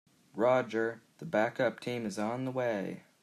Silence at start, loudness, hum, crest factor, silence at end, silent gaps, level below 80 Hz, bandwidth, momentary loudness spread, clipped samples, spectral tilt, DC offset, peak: 0.35 s; -33 LUFS; none; 18 dB; 0.25 s; none; -80 dBFS; 13.5 kHz; 10 LU; under 0.1%; -6 dB/octave; under 0.1%; -16 dBFS